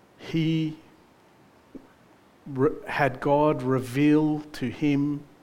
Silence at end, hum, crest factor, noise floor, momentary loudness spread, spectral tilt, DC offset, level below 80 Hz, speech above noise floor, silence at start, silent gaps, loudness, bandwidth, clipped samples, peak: 0.2 s; none; 20 dB; -57 dBFS; 10 LU; -7.5 dB/octave; under 0.1%; -56 dBFS; 32 dB; 0.2 s; none; -25 LUFS; 15.5 kHz; under 0.1%; -8 dBFS